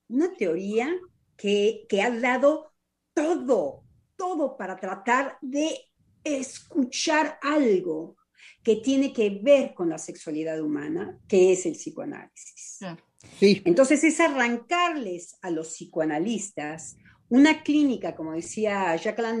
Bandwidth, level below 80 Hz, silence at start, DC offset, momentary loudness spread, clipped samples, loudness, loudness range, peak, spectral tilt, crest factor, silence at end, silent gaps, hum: 11 kHz; -72 dBFS; 0.1 s; under 0.1%; 15 LU; under 0.1%; -25 LUFS; 4 LU; -6 dBFS; -4.5 dB/octave; 18 dB; 0 s; none; none